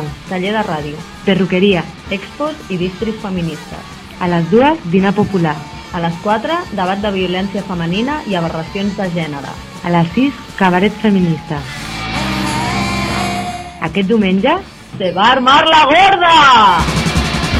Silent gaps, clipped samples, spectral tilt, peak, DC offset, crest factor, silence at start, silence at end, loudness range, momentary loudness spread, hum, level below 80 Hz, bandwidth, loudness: none; under 0.1%; -5.5 dB/octave; 0 dBFS; under 0.1%; 14 dB; 0 s; 0 s; 8 LU; 15 LU; none; -34 dBFS; 14 kHz; -14 LUFS